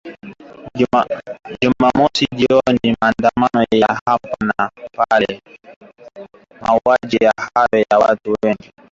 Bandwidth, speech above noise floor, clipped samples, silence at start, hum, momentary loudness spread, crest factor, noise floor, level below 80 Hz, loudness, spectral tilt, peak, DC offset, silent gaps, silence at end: 7.8 kHz; 20 dB; under 0.1%; 0.05 s; none; 10 LU; 16 dB; -36 dBFS; -48 dBFS; -16 LUFS; -5.5 dB/octave; 0 dBFS; under 0.1%; 4.01-4.06 s, 5.76-5.81 s; 0.35 s